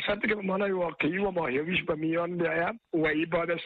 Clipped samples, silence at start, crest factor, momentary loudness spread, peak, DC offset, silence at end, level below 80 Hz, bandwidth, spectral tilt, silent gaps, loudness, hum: under 0.1%; 0 s; 14 dB; 2 LU; -14 dBFS; under 0.1%; 0 s; -58 dBFS; 4.7 kHz; -8.5 dB/octave; none; -29 LUFS; none